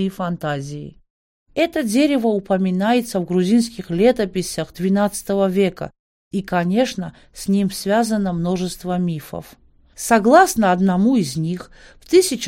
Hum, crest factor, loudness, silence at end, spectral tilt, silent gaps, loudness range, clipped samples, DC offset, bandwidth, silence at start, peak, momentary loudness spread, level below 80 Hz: none; 18 dB; -19 LUFS; 0 s; -5.5 dB/octave; 1.10-1.46 s, 5.99-6.31 s; 4 LU; under 0.1%; under 0.1%; 16.5 kHz; 0 s; 0 dBFS; 13 LU; -48 dBFS